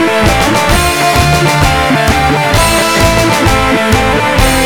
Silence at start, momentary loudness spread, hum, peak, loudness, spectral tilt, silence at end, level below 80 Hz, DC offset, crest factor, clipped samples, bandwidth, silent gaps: 0 s; 1 LU; none; 0 dBFS; -9 LUFS; -4 dB/octave; 0 s; -18 dBFS; 2%; 8 dB; 0.2%; over 20 kHz; none